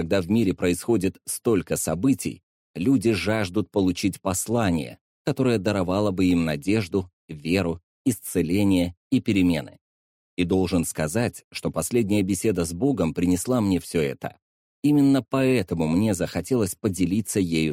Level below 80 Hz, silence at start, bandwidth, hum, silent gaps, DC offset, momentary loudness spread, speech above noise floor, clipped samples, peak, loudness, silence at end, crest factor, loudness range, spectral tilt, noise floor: -50 dBFS; 0 s; 16.5 kHz; none; 2.43-2.74 s, 5.01-5.25 s, 7.13-7.28 s, 7.83-8.05 s, 8.97-9.10 s, 9.81-10.37 s, 11.44-11.51 s, 14.42-14.82 s; under 0.1%; 7 LU; over 67 dB; under 0.1%; -10 dBFS; -24 LUFS; 0 s; 14 dB; 2 LU; -5.5 dB/octave; under -90 dBFS